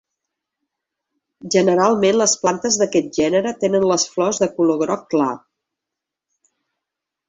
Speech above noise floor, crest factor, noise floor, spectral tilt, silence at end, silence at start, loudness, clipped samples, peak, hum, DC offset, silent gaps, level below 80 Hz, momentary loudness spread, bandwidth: 67 dB; 18 dB; -84 dBFS; -4 dB/octave; 1.9 s; 1.45 s; -18 LUFS; under 0.1%; -2 dBFS; none; under 0.1%; none; -60 dBFS; 5 LU; 8.4 kHz